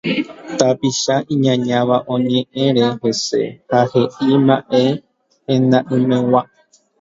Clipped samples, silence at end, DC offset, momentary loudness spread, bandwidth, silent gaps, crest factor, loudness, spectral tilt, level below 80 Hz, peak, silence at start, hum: under 0.1%; 0.55 s; under 0.1%; 6 LU; 7.8 kHz; none; 16 dB; -16 LUFS; -5.5 dB/octave; -58 dBFS; 0 dBFS; 0.05 s; none